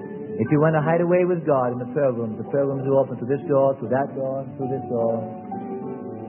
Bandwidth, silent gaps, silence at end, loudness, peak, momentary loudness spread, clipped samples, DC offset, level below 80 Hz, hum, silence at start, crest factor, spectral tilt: 3.2 kHz; none; 0 s; -23 LUFS; -6 dBFS; 12 LU; under 0.1%; under 0.1%; -66 dBFS; none; 0 s; 16 dB; -13.5 dB/octave